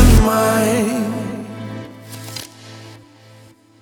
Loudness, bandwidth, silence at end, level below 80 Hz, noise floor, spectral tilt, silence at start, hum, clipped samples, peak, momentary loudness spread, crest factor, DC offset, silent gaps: -18 LUFS; 19.5 kHz; 0.85 s; -22 dBFS; -46 dBFS; -5.5 dB/octave; 0 s; none; under 0.1%; 0 dBFS; 23 LU; 18 dB; under 0.1%; none